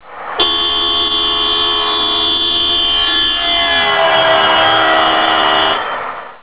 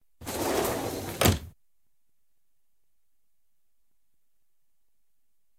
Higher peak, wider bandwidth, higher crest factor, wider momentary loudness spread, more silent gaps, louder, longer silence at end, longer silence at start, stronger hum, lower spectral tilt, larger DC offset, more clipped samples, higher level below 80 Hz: first, 0 dBFS vs -6 dBFS; second, 4 kHz vs 17.5 kHz; second, 12 dB vs 28 dB; second, 4 LU vs 9 LU; neither; first, -10 LUFS vs -28 LUFS; second, 0.05 s vs 4.1 s; second, 0.05 s vs 0.2 s; neither; first, -6 dB/octave vs -4 dB/octave; first, 0.7% vs under 0.1%; neither; first, -40 dBFS vs -50 dBFS